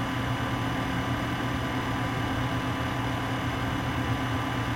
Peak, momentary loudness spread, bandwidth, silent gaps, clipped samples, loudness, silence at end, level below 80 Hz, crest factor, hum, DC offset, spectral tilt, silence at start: -16 dBFS; 1 LU; 16.5 kHz; none; under 0.1%; -29 LUFS; 0 s; -42 dBFS; 12 dB; none; under 0.1%; -5.5 dB/octave; 0 s